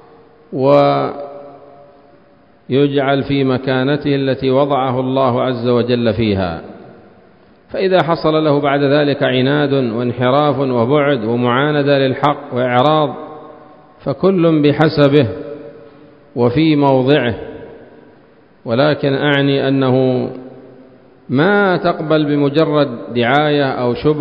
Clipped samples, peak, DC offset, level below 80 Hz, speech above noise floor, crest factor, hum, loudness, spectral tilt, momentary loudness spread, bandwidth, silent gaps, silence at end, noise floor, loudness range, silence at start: under 0.1%; 0 dBFS; 0.2%; -46 dBFS; 35 dB; 14 dB; none; -14 LUFS; -9 dB/octave; 13 LU; 5.4 kHz; none; 0 s; -48 dBFS; 3 LU; 0.5 s